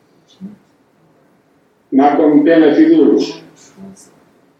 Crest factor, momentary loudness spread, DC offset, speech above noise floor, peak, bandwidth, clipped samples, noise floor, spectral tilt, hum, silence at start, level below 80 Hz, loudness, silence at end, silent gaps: 14 dB; 10 LU; under 0.1%; 44 dB; 0 dBFS; 8 kHz; under 0.1%; -55 dBFS; -6.5 dB/octave; none; 0.4 s; -68 dBFS; -11 LUFS; 0.7 s; none